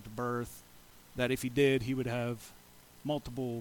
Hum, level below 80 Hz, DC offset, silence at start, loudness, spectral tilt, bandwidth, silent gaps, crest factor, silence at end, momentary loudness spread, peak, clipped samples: none; -58 dBFS; under 0.1%; 0 s; -34 LUFS; -6 dB/octave; 19 kHz; none; 18 dB; 0 s; 17 LU; -16 dBFS; under 0.1%